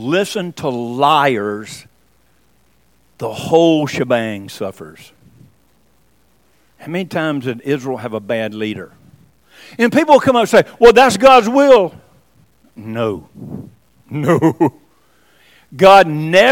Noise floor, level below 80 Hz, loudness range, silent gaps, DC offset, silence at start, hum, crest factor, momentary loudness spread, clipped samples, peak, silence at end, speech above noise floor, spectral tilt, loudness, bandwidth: -57 dBFS; -48 dBFS; 13 LU; none; 0.1%; 0 s; none; 16 dB; 19 LU; 0.6%; 0 dBFS; 0 s; 43 dB; -5 dB/octave; -13 LUFS; 17 kHz